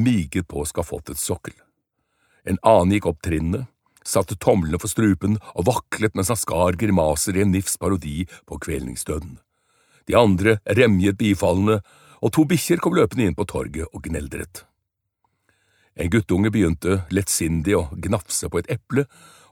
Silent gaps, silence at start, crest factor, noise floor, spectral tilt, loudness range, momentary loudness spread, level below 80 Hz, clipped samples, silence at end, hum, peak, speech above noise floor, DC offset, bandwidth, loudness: none; 0 s; 20 dB; -78 dBFS; -5.5 dB/octave; 5 LU; 13 LU; -40 dBFS; under 0.1%; 0.45 s; none; -2 dBFS; 58 dB; under 0.1%; 18.5 kHz; -21 LUFS